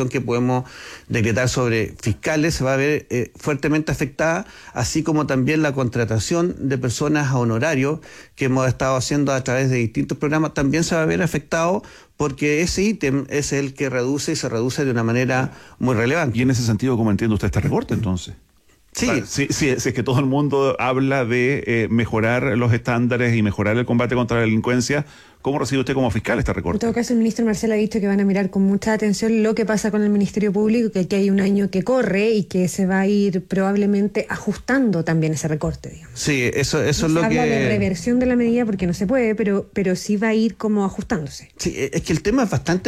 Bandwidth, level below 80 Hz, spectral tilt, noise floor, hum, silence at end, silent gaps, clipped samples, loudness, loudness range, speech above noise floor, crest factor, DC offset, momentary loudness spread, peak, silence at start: 14.5 kHz; -42 dBFS; -6 dB/octave; -46 dBFS; none; 0 s; none; under 0.1%; -20 LUFS; 2 LU; 26 dB; 12 dB; under 0.1%; 6 LU; -8 dBFS; 0 s